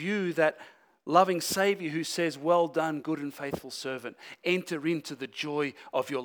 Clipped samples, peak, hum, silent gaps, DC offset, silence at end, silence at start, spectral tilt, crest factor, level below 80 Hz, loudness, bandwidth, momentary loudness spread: under 0.1%; -8 dBFS; none; none; under 0.1%; 0 s; 0 s; -4.5 dB/octave; 22 dB; -72 dBFS; -29 LUFS; over 20 kHz; 11 LU